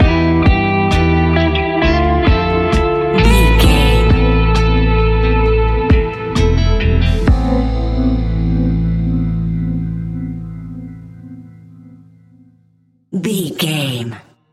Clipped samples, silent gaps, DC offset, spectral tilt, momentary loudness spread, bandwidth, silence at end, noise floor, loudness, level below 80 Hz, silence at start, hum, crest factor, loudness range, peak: under 0.1%; none; under 0.1%; -6.5 dB/octave; 13 LU; 14 kHz; 0.35 s; -55 dBFS; -14 LUFS; -18 dBFS; 0 s; none; 14 dB; 13 LU; 0 dBFS